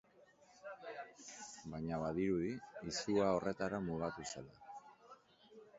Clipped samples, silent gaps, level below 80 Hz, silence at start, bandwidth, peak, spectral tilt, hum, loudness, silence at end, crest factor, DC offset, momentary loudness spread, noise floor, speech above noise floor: under 0.1%; none; -66 dBFS; 0.5 s; 7.6 kHz; -20 dBFS; -5.5 dB/octave; none; -41 LUFS; 0 s; 22 dB; under 0.1%; 20 LU; -67 dBFS; 28 dB